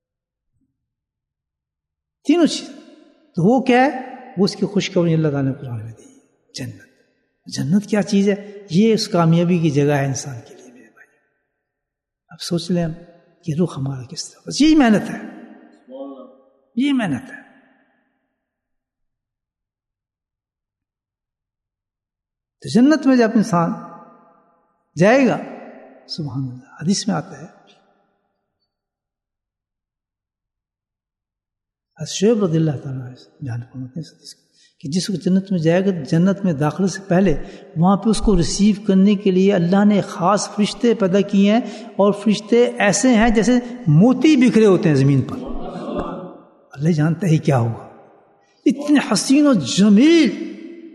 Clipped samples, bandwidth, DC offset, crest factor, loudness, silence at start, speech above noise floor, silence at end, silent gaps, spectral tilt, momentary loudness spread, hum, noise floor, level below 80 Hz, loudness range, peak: under 0.1%; 12 kHz; under 0.1%; 18 dB; -17 LUFS; 2.25 s; 71 dB; 0.05 s; none; -6 dB/octave; 18 LU; none; -87 dBFS; -42 dBFS; 11 LU; -2 dBFS